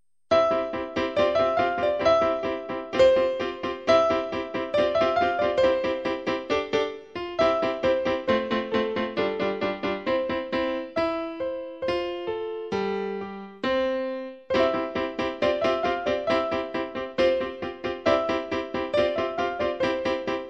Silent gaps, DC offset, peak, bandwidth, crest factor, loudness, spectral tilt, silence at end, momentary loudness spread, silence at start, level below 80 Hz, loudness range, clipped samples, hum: none; under 0.1%; -8 dBFS; 8 kHz; 16 dB; -25 LUFS; -5.5 dB/octave; 0 s; 9 LU; 0.3 s; -54 dBFS; 5 LU; under 0.1%; none